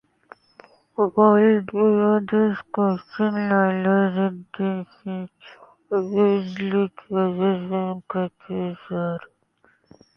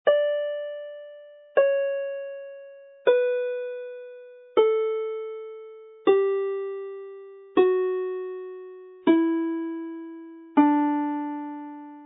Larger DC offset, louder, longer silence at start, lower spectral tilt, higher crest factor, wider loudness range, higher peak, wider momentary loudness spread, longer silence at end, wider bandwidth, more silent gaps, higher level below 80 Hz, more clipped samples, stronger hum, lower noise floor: neither; first, -22 LUFS vs -25 LUFS; first, 1 s vs 0.05 s; about the same, -9.5 dB/octave vs -8.5 dB/octave; about the same, 18 dB vs 18 dB; first, 6 LU vs 1 LU; about the same, -4 dBFS vs -6 dBFS; second, 12 LU vs 20 LU; first, 0.9 s vs 0 s; first, 5.8 kHz vs 4 kHz; neither; first, -66 dBFS vs -82 dBFS; neither; neither; first, -62 dBFS vs -47 dBFS